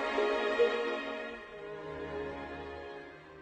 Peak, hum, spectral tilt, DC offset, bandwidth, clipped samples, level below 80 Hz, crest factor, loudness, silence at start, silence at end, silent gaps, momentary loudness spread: -16 dBFS; none; -4.5 dB/octave; under 0.1%; 9.2 kHz; under 0.1%; -60 dBFS; 18 dB; -35 LUFS; 0 s; 0 s; none; 15 LU